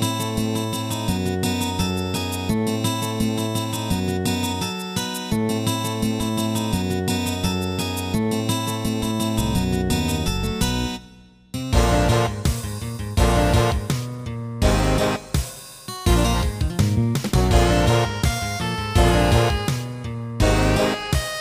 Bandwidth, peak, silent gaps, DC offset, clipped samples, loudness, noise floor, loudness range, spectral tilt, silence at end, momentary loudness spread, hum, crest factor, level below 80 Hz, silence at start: 16 kHz; -4 dBFS; none; under 0.1%; under 0.1%; -22 LUFS; -47 dBFS; 4 LU; -5 dB/octave; 0 s; 8 LU; none; 18 dB; -28 dBFS; 0 s